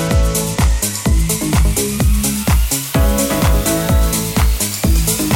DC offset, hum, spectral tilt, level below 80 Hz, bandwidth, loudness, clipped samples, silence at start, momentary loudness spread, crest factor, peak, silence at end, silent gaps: under 0.1%; none; -4.5 dB/octave; -16 dBFS; 17 kHz; -15 LUFS; under 0.1%; 0 s; 2 LU; 14 dB; 0 dBFS; 0 s; none